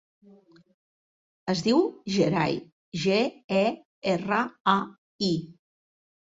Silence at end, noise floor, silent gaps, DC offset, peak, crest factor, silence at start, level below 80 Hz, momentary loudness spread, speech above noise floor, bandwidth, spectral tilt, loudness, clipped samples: 0.7 s; -56 dBFS; 2.72-2.92 s, 3.44-3.49 s, 3.85-4.02 s, 4.60-4.65 s, 4.98-5.19 s; under 0.1%; -6 dBFS; 22 dB; 1.45 s; -64 dBFS; 9 LU; 30 dB; 7.8 kHz; -5.5 dB/octave; -26 LUFS; under 0.1%